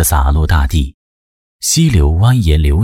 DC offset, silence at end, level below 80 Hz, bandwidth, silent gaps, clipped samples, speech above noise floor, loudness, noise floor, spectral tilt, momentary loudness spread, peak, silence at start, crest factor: under 0.1%; 0 s; -16 dBFS; 16.5 kHz; 0.94-1.59 s; under 0.1%; over 79 dB; -12 LUFS; under -90 dBFS; -5 dB/octave; 7 LU; -2 dBFS; 0 s; 10 dB